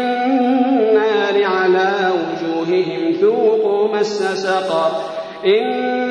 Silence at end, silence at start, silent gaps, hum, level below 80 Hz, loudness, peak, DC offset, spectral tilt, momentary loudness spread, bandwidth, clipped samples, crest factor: 0 s; 0 s; none; none; -66 dBFS; -16 LUFS; -4 dBFS; under 0.1%; -5 dB/octave; 6 LU; 10 kHz; under 0.1%; 12 dB